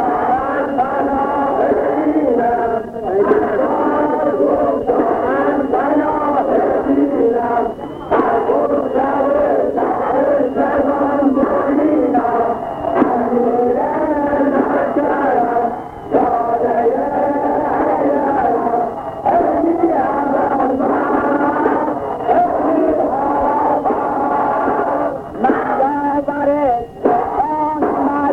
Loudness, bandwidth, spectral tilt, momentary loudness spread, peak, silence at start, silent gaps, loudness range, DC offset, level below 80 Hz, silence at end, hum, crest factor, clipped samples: -16 LUFS; 5.8 kHz; -8.5 dB/octave; 3 LU; -2 dBFS; 0 s; none; 1 LU; under 0.1%; -44 dBFS; 0 s; none; 14 dB; under 0.1%